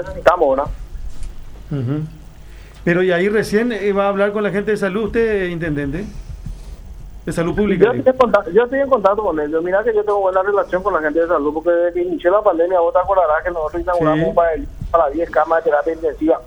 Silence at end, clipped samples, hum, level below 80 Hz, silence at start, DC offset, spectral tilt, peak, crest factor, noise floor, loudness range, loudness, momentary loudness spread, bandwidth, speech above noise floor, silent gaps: 0 s; under 0.1%; none; -36 dBFS; 0 s; under 0.1%; -7 dB/octave; 0 dBFS; 16 dB; -37 dBFS; 4 LU; -17 LUFS; 15 LU; 14 kHz; 20 dB; none